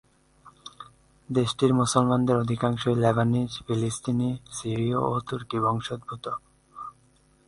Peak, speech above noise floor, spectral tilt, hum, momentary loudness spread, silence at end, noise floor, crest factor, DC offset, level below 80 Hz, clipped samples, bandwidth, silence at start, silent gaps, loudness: -6 dBFS; 36 dB; -6 dB/octave; none; 20 LU; 0.55 s; -61 dBFS; 22 dB; under 0.1%; -56 dBFS; under 0.1%; 11.5 kHz; 0.45 s; none; -26 LUFS